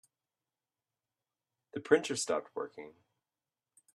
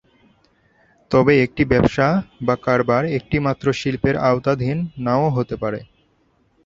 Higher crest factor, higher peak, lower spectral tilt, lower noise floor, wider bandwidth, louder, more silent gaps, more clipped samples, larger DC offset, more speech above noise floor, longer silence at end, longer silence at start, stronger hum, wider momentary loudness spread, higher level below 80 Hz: first, 28 dB vs 18 dB; second, -10 dBFS vs -2 dBFS; second, -3 dB/octave vs -7.5 dB/octave; first, under -90 dBFS vs -61 dBFS; first, 12.5 kHz vs 7.6 kHz; second, -33 LUFS vs -19 LUFS; neither; neither; neither; first, over 57 dB vs 43 dB; first, 1.05 s vs 0.8 s; first, 1.75 s vs 1.1 s; neither; first, 20 LU vs 8 LU; second, -84 dBFS vs -44 dBFS